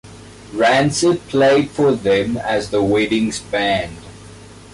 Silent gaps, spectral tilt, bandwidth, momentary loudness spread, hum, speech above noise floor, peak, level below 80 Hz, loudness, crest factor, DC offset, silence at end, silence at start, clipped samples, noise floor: none; -4.5 dB/octave; 11.5 kHz; 7 LU; none; 23 dB; -6 dBFS; -46 dBFS; -17 LUFS; 12 dB; under 0.1%; 0.15 s; 0.05 s; under 0.1%; -39 dBFS